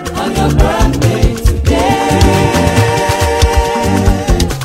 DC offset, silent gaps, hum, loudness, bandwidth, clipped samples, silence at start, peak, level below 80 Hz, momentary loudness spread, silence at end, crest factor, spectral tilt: under 0.1%; none; none; -12 LUFS; 16 kHz; 0.2%; 0 s; 0 dBFS; -16 dBFS; 3 LU; 0 s; 10 dB; -5.5 dB/octave